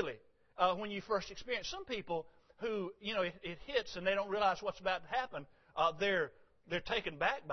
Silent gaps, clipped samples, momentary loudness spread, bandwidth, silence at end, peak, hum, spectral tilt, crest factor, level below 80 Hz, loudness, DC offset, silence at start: none; under 0.1%; 9 LU; 6.2 kHz; 0 s; -18 dBFS; none; -1.5 dB/octave; 20 dB; -62 dBFS; -37 LUFS; under 0.1%; 0 s